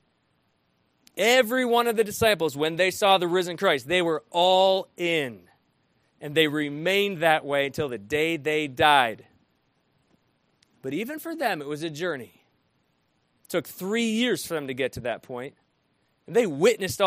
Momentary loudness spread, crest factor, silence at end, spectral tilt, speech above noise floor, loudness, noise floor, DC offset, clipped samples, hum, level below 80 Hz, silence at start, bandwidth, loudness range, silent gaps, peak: 13 LU; 22 dB; 0 s; -4 dB/octave; 46 dB; -24 LUFS; -70 dBFS; under 0.1%; under 0.1%; none; -62 dBFS; 1.15 s; 15.5 kHz; 11 LU; none; -4 dBFS